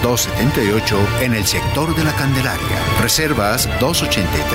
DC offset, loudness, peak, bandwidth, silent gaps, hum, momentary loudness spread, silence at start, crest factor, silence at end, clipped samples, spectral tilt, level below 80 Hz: under 0.1%; -16 LUFS; -4 dBFS; 16.5 kHz; none; none; 3 LU; 0 s; 14 dB; 0 s; under 0.1%; -4 dB/octave; -30 dBFS